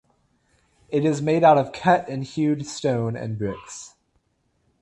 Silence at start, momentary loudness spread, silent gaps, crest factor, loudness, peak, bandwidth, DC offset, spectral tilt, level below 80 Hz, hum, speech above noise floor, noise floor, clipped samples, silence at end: 0.9 s; 13 LU; none; 20 dB; -22 LUFS; -4 dBFS; 11.5 kHz; under 0.1%; -6.5 dB/octave; -58 dBFS; none; 47 dB; -69 dBFS; under 0.1%; 0.95 s